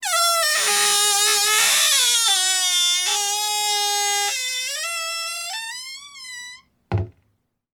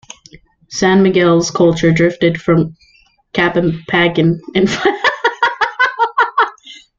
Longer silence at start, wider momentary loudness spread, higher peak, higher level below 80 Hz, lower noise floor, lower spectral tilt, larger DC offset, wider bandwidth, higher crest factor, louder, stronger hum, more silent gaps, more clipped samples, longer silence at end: second, 0 s vs 0.35 s; first, 19 LU vs 5 LU; second, -4 dBFS vs 0 dBFS; second, -54 dBFS vs -44 dBFS; first, -69 dBFS vs -44 dBFS; second, 0.5 dB/octave vs -5.5 dB/octave; neither; first, over 20 kHz vs 7.6 kHz; about the same, 18 dB vs 14 dB; second, -18 LUFS vs -14 LUFS; neither; neither; neither; first, 0.65 s vs 0.25 s